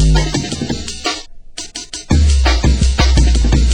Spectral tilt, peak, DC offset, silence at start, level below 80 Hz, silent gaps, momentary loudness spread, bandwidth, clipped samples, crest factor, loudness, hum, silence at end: -5 dB/octave; 0 dBFS; under 0.1%; 0 s; -14 dBFS; none; 14 LU; 10 kHz; under 0.1%; 12 dB; -15 LUFS; none; 0 s